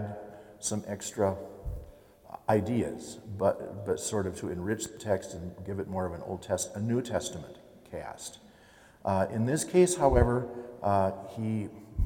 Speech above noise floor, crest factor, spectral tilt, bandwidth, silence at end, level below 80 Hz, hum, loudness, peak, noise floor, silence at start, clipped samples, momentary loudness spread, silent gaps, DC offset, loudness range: 27 dB; 24 dB; -5.5 dB/octave; 18 kHz; 0 s; -46 dBFS; none; -31 LUFS; -8 dBFS; -57 dBFS; 0 s; under 0.1%; 17 LU; none; under 0.1%; 7 LU